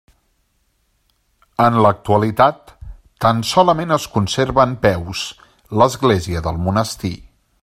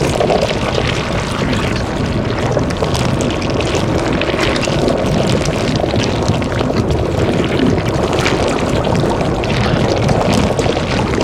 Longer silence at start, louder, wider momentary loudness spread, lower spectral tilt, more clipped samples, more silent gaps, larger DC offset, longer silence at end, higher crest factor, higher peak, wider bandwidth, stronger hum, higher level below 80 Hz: first, 1.6 s vs 0 s; about the same, -17 LUFS vs -15 LUFS; first, 12 LU vs 3 LU; about the same, -5.5 dB/octave vs -5.5 dB/octave; neither; neither; neither; first, 0.45 s vs 0 s; about the same, 18 dB vs 14 dB; about the same, 0 dBFS vs 0 dBFS; about the same, 15.5 kHz vs 15 kHz; neither; second, -42 dBFS vs -26 dBFS